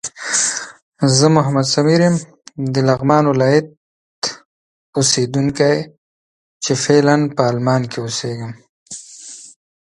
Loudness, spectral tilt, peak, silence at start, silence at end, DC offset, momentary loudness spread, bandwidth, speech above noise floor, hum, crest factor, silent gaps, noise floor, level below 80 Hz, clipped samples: -16 LUFS; -4.5 dB/octave; 0 dBFS; 0.05 s; 0.45 s; under 0.1%; 20 LU; 11.5 kHz; 22 dB; none; 18 dB; 0.82-0.92 s, 3.77-4.22 s, 4.45-4.93 s, 5.98-6.60 s, 8.69-8.86 s; -37 dBFS; -56 dBFS; under 0.1%